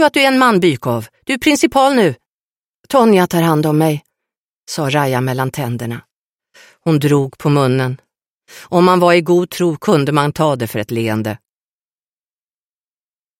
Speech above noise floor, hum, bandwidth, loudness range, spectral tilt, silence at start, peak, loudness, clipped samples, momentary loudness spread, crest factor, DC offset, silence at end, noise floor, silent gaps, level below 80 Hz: over 76 dB; none; 16.5 kHz; 5 LU; -6 dB/octave; 0 s; 0 dBFS; -14 LUFS; under 0.1%; 12 LU; 16 dB; under 0.1%; 2.05 s; under -90 dBFS; 2.26-2.84 s, 4.38-4.63 s, 6.13-6.39 s, 8.30-8.40 s; -54 dBFS